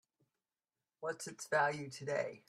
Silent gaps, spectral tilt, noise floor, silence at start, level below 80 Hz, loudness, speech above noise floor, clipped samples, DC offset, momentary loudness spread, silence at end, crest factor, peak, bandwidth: none; -4 dB/octave; under -90 dBFS; 1 s; -84 dBFS; -38 LUFS; over 52 dB; under 0.1%; under 0.1%; 11 LU; 0.1 s; 20 dB; -20 dBFS; 14 kHz